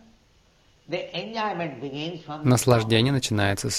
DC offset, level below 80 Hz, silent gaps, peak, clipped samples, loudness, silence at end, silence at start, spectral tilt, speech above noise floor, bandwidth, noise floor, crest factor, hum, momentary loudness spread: under 0.1%; -54 dBFS; none; -6 dBFS; under 0.1%; -24 LUFS; 0 s; 0.9 s; -5 dB/octave; 36 dB; 15.5 kHz; -60 dBFS; 20 dB; none; 13 LU